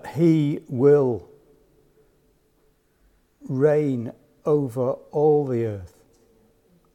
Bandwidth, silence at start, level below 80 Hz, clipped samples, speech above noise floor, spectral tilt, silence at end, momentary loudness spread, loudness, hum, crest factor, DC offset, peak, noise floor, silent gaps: 11.5 kHz; 0.05 s; -64 dBFS; under 0.1%; 43 dB; -9.5 dB/octave; 1.1 s; 13 LU; -22 LUFS; none; 18 dB; under 0.1%; -6 dBFS; -63 dBFS; none